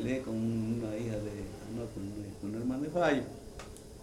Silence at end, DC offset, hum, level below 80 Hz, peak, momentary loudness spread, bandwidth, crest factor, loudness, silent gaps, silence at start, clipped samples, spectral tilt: 0 s; under 0.1%; none; -54 dBFS; -18 dBFS; 15 LU; 16 kHz; 18 dB; -35 LUFS; none; 0 s; under 0.1%; -6.5 dB/octave